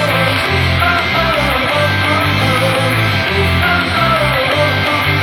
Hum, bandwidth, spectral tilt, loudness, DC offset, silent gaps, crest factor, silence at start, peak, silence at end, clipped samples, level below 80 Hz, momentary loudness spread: none; 17.5 kHz; -5 dB/octave; -12 LUFS; under 0.1%; none; 12 dB; 0 s; 0 dBFS; 0 s; under 0.1%; -30 dBFS; 1 LU